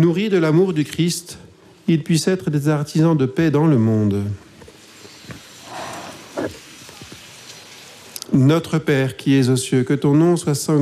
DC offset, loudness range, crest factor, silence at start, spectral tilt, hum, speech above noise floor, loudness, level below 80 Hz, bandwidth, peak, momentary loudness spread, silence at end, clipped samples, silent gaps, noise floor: under 0.1%; 15 LU; 14 dB; 0 s; -6.5 dB/octave; none; 27 dB; -18 LUFS; -56 dBFS; 15 kHz; -6 dBFS; 22 LU; 0 s; under 0.1%; none; -43 dBFS